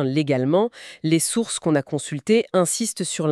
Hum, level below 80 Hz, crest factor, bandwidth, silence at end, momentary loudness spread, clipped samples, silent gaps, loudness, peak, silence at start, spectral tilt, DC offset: none; -68 dBFS; 16 dB; 13.5 kHz; 0 s; 7 LU; under 0.1%; none; -22 LUFS; -6 dBFS; 0 s; -4.5 dB/octave; under 0.1%